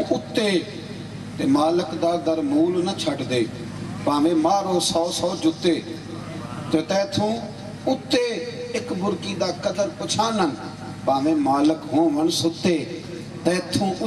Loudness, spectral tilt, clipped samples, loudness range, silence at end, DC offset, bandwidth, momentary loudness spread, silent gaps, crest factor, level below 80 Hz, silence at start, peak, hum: -23 LUFS; -5 dB/octave; under 0.1%; 3 LU; 0 s; under 0.1%; 13 kHz; 13 LU; none; 18 dB; -56 dBFS; 0 s; -4 dBFS; none